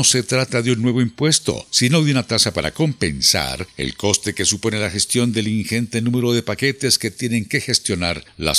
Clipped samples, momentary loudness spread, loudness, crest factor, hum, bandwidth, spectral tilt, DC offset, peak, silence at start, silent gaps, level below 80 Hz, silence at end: under 0.1%; 6 LU; -18 LUFS; 18 dB; none; 15 kHz; -3.5 dB/octave; under 0.1%; 0 dBFS; 0 s; none; -46 dBFS; 0 s